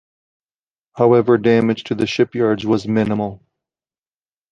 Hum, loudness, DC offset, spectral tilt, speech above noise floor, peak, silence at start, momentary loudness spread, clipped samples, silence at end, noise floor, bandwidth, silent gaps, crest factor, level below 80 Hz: none; -17 LUFS; under 0.1%; -7 dB/octave; over 74 dB; -2 dBFS; 0.95 s; 7 LU; under 0.1%; 1.15 s; under -90 dBFS; 7.6 kHz; none; 16 dB; -54 dBFS